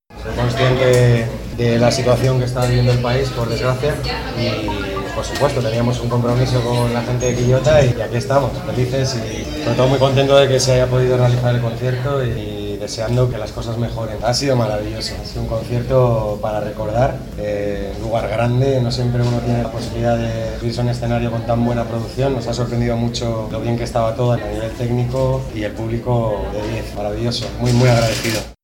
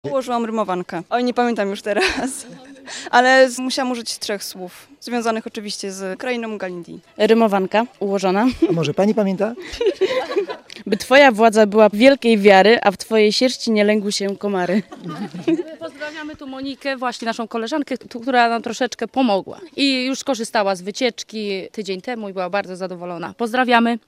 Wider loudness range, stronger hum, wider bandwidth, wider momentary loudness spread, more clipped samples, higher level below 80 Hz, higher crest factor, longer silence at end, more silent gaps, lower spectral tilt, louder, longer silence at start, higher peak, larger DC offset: second, 4 LU vs 10 LU; neither; about the same, 16.5 kHz vs 15.5 kHz; second, 9 LU vs 17 LU; neither; first, -32 dBFS vs -54 dBFS; about the same, 18 dB vs 18 dB; about the same, 0.1 s vs 0.1 s; neither; first, -6 dB/octave vs -4.5 dB/octave; about the same, -18 LUFS vs -18 LUFS; about the same, 0.1 s vs 0.05 s; about the same, 0 dBFS vs 0 dBFS; neither